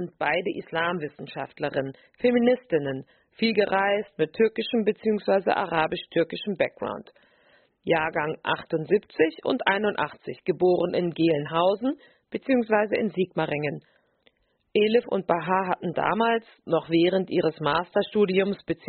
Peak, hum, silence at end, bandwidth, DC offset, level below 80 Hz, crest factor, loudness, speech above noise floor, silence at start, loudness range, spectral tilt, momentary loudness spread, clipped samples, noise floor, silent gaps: -4 dBFS; none; 0.15 s; 4.5 kHz; under 0.1%; -64 dBFS; 20 dB; -25 LUFS; 41 dB; 0 s; 3 LU; -4 dB/octave; 9 LU; under 0.1%; -66 dBFS; none